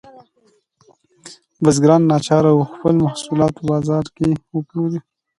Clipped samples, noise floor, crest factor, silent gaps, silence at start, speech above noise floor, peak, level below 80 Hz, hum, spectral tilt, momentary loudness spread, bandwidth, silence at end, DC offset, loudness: under 0.1%; -60 dBFS; 18 dB; none; 1.25 s; 44 dB; 0 dBFS; -50 dBFS; none; -7 dB/octave; 10 LU; 11.5 kHz; 0.4 s; under 0.1%; -17 LUFS